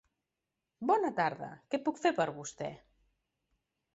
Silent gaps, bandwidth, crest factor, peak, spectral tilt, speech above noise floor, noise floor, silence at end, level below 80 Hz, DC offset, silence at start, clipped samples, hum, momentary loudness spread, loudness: none; 8 kHz; 20 dB; -16 dBFS; -4 dB/octave; 55 dB; -88 dBFS; 1.2 s; -74 dBFS; under 0.1%; 0.8 s; under 0.1%; none; 13 LU; -34 LUFS